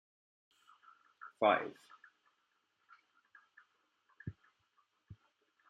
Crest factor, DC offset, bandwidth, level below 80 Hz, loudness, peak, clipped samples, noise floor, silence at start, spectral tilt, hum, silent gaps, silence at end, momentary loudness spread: 28 dB; under 0.1%; 9.4 kHz; -78 dBFS; -34 LUFS; -16 dBFS; under 0.1%; -80 dBFS; 1.25 s; -6.5 dB/octave; none; none; 0.55 s; 27 LU